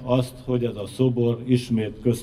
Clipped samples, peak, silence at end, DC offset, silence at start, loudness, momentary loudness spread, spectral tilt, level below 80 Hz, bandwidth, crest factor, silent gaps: under 0.1%; -6 dBFS; 0 s; under 0.1%; 0 s; -24 LUFS; 5 LU; -7.5 dB/octave; -48 dBFS; 13.5 kHz; 16 dB; none